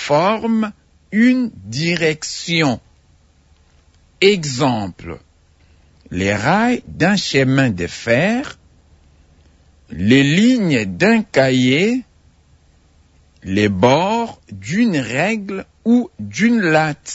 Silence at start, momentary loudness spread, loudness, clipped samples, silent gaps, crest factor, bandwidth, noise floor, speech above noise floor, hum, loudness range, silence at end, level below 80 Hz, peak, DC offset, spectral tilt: 0 s; 12 LU; -16 LUFS; under 0.1%; none; 16 dB; 8 kHz; -53 dBFS; 37 dB; none; 4 LU; 0 s; -50 dBFS; -2 dBFS; under 0.1%; -5.5 dB/octave